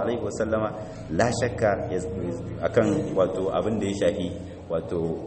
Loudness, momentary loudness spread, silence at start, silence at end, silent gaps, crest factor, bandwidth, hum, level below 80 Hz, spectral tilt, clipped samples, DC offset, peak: -26 LUFS; 8 LU; 0 s; 0 s; none; 18 dB; 8.8 kHz; none; -48 dBFS; -6 dB/octave; under 0.1%; under 0.1%; -6 dBFS